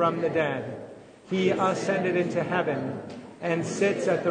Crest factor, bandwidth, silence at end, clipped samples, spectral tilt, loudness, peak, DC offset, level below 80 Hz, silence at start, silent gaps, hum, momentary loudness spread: 16 dB; 9.6 kHz; 0 s; under 0.1%; -6 dB/octave; -27 LUFS; -10 dBFS; under 0.1%; -70 dBFS; 0 s; none; none; 14 LU